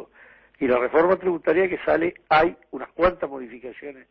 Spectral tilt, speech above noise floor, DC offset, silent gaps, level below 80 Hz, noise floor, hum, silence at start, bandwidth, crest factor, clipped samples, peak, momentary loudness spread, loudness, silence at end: -8.5 dB/octave; 30 dB; under 0.1%; none; -50 dBFS; -52 dBFS; none; 0 s; 5.8 kHz; 18 dB; under 0.1%; -6 dBFS; 18 LU; -22 LUFS; 0.2 s